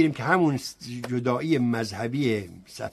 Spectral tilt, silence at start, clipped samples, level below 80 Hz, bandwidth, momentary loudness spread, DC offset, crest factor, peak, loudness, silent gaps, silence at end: -6 dB/octave; 0 s; under 0.1%; -62 dBFS; 13 kHz; 13 LU; under 0.1%; 20 dB; -6 dBFS; -26 LUFS; none; 0 s